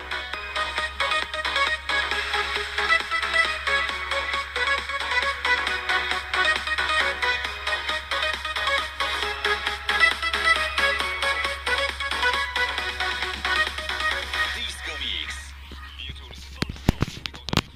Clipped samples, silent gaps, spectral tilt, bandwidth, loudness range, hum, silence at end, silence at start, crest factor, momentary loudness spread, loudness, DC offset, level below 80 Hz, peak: under 0.1%; none; -2.5 dB/octave; 15.5 kHz; 5 LU; none; 0 s; 0 s; 22 dB; 9 LU; -24 LUFS; under 0.1%; -40 dBFS; -4 dBFS